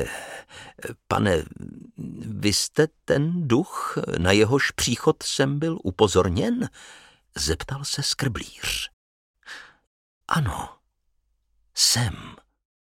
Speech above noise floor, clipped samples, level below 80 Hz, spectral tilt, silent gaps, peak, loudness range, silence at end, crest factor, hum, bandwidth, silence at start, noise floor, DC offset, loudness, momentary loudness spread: 47 dB; under 0.1%; -46 dBFS; -4 dB/octave; 8.93-9.34 s, 9.87-10.21 s; -4 dBFS; 7 LU; 0.6 s; 22 dB; none; 16.5 kHz; 0 s; -71 dBFS; under 0.1%; -23 LUFS; 20 LU